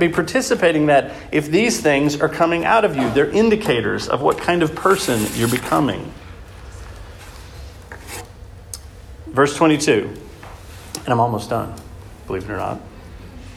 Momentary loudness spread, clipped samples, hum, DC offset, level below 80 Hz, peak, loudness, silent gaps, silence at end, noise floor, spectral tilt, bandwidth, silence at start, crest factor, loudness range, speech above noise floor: 23 LU; under 0.1%; none; under 0.1%; -42 dBFS; -2 dBFS; -18 LUFS; none; 0 s; -38 dBFS; -5 dB/octave; 16.5 kHz; 0 s; 16 dB; 10 LU; 20 dB